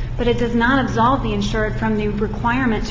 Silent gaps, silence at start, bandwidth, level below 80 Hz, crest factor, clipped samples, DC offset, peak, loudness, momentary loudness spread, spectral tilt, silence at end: none; 0 s; 7.6 kHz; -28 dBFS; 14 dB; under 0.1%; under 0.1%; -4 dBFS; -19 LUFS; 5 LU; -6.5 dB/octave; 0 s